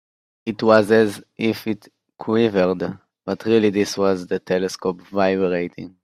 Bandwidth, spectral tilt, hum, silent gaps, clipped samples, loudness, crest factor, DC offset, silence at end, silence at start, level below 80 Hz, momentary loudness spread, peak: 14.5 kHz; -6 dB/octave; none; none; under 0.1%; -20 LUFS; 20 dB; under 0.1%; 0.15 s; 0.45 s; -62 dBFS; 14 LU; 0 dBFS